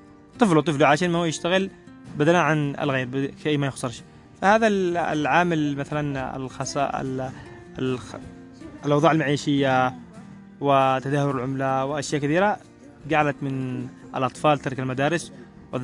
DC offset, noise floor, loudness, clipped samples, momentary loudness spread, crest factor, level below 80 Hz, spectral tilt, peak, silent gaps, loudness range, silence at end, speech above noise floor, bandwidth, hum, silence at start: under 0.1%; -43 dBFS; -23 LUFS; under 0.1%; 15 LU; 20 dB; -56 dBFS; -5.5 dB/octave; -4 dBFS; none; 3 LU; 0 s; 21 dB; 11.5 kHz; none; 0.35 s